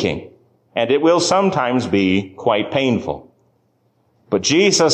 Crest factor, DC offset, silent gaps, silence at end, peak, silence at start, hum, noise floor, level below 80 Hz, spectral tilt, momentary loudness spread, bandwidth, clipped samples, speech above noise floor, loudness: 14 dB; under 0.1%; none; 0 s; -4 dBFS; 0 s; none; -62 dBFS; -48 dBFS; -4 dB/octave; 11 LU; 9.8 kHz; under 0.1%; 46 dB; -17 LUFS